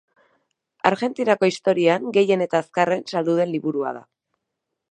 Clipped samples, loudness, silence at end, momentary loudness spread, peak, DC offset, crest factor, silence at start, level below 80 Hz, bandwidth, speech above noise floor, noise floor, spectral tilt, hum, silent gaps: under 0.1%; -21 LUFS; 0.9 s; 6 LU; 0 dBFS; under 0.1%; 22 dB; 0.85 s; -70 dBFS; 9.6 kHz; 60 dB; -80 dBFS; -6 dB/octave; none; none